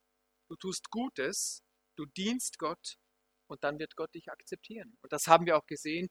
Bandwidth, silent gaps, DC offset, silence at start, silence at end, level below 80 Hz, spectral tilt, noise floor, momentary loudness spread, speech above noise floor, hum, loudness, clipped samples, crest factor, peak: over 20 kHz; none; under 0.1%; 0.5 s; 0.05 s; -74 dBFS; -3.5 dB/octave; -79 dBFS; 21 LU; 45 dB; none; -33 LUFS; under 0.1%; 28 dB; -6 dBFS